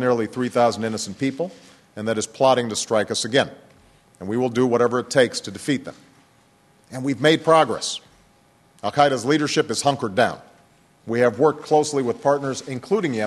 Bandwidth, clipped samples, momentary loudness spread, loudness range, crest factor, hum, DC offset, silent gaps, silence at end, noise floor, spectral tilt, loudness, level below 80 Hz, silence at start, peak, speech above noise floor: 12.5 kHz; under 0.1%; 11 LU; 3 LU; 22 dB; none; under 0.1%; none; 0 s; -57 dBFS; -4.5 dB/octave; -21 LUFS; -64 dBFS; 0 s; 0 dBFS; 36 dB